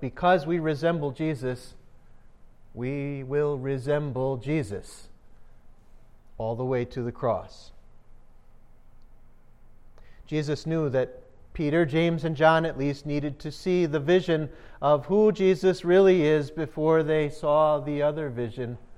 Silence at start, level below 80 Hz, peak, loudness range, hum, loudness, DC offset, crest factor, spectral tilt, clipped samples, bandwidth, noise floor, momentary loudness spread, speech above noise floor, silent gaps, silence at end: 0 s; -50 dBFS; -6 dBFS; 11 LU; none; -26 LUFS; under 0.1%; 20 dB; -7.5 dB/octave; under 0.1%; 11.5 kHz; -50 dBFS; 12 LU; 25 dB; none; 0 s